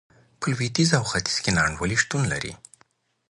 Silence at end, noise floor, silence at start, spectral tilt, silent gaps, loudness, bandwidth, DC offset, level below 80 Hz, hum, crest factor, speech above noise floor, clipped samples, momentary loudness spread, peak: 0.75 s; -63 dBFS; 0.4 s; -4 dB/octave; none; -23 LUFS; 11.5 kHz; under 0.1%; -46 dBFS; none; 20 dB; 40 dB; under 0.1%; 9 LU; -4 dBFS